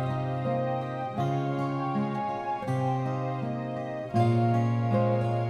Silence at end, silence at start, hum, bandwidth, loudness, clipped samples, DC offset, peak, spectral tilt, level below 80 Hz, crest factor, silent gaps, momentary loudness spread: 0 s; 0 s; none; 8.8 kHz; -29 LUFS; under 0.1%; under 0.1%; -14 dBFS; -9 dB/octave; -62 dBFS; 14 dB; none; 7 LU